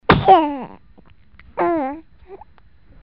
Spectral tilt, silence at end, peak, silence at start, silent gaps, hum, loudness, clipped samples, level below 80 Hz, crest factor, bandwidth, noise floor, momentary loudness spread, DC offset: -4.5 dB/octave; 0.65 s; 0 dBFS; 0.1 s; none; none; -17 LUFS; under 0.1%; -40 dBFS; 20 dB; 5.6 kHz; -51 dBFS; 23 LU; 0.4%